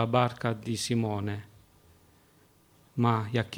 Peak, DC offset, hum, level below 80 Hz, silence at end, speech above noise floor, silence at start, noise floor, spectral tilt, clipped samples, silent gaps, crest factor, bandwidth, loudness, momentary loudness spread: -8 dBFS; under 0.1%; none; -64 dBFS; 0 s; 34 dB; 0 s; -62 dBFS; -6 dB/octave; under 0.1%; none; 22 dB; 15.5 kHz; -30 LUFS; 10 LU